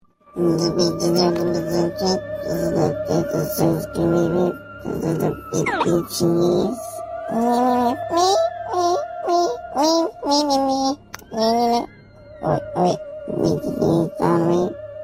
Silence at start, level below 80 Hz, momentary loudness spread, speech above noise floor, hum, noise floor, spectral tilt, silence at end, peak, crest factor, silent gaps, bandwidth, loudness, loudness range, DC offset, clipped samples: 0.35 s; -48 dBFS; 8 LU; 23 dB; none; -43 dBFS; -5.5 dB/octave; 0 s; -4 dBFS; 16 dB; none; 16 kHz; -20 LUFS; 2 LU; under 0.1%; under 0.1%